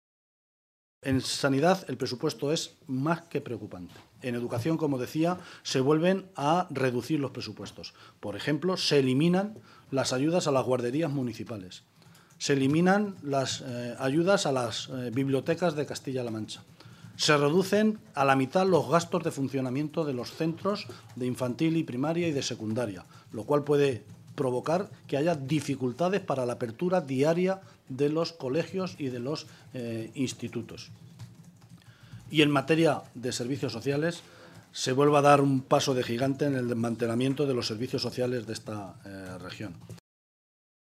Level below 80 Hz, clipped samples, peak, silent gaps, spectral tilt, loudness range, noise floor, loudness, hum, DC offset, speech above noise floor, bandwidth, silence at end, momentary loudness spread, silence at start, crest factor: -70 dBFS; under 0.1%; -6 dBFS; none; -5.5 dB/octave; 6 LU; -56 dBFS; -28 LUFS; none; under 0.1%; 28 dB; 15 kHz; 1 s; 16 LU; 1.05 s; 24 dB